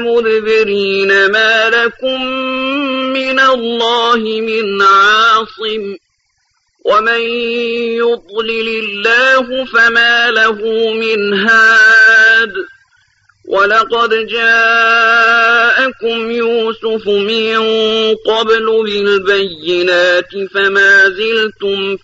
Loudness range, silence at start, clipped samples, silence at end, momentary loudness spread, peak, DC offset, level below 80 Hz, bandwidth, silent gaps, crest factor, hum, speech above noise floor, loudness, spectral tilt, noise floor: 5 LU; 0 s; under 0.1%; 0.05 s; 9 LU; 0 dBFS; under 0.1%; -54 dBFS; 8 kHz; none; 10 dB; none; 50 dB; -10 LUFS; -3 dB/octave; -62 dBFS